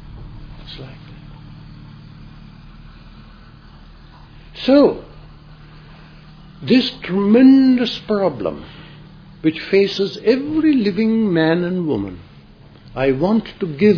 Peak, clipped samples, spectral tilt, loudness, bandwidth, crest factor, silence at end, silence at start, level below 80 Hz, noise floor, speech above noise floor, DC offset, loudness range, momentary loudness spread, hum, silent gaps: 0 dBFS; under 0.1%; -7.5 dB/octave; -16 LUFS; 5.4 kHz; 18 dB; 0 s; 0 s; -44 dBFS; -43 dBFS; 28 dB; under 0.1%; 5 LU; 26 LU; none; none